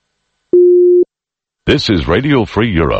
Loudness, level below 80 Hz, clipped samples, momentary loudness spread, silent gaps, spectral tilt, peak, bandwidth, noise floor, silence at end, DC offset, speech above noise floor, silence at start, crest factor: -12 LUFS; -30 dBFS; under 0.1%; 7 LU; none; -7 dB/octave; 0 dBFS; 7.8 kHz; -85 dBFS; 0 s; under 0.1%; 73 dB; 0.55 s; 12 dB